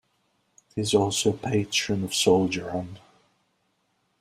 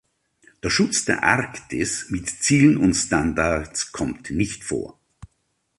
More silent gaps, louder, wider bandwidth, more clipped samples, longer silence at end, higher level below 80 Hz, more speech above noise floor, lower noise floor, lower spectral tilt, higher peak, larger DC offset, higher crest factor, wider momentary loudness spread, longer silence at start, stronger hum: neither; second, -24 LUFS vs -21 LUFS; first, 15.5 kHz vs 11.5 kHz; neither; first, 1.25 s vs 0.85 s; second, -60 dBFS vs -44 dBFS; about the same, 47 dB vs 50 dB; about the same, -72 dBFS vs -71 dBFS; about the same, -4 dB/octave vs -4 dB/octave; second, -6 dBFS vs -2 dBFS; neither; about the same, 22 dB vs 20 dB; about the same, 12 LU vs 12 LU; about the same, 0.75 s vs 0.65 s; neither